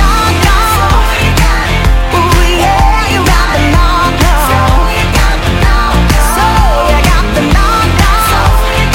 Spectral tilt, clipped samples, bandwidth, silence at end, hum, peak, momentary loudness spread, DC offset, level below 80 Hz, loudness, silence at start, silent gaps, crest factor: -4.5 dB/octave; 0.1%; 17 kHz; 0 s; none; 0 dBFS; 2 LU; under 0.1%; -10 dBFS; -9 LUFS; 0 s; none; 8 dB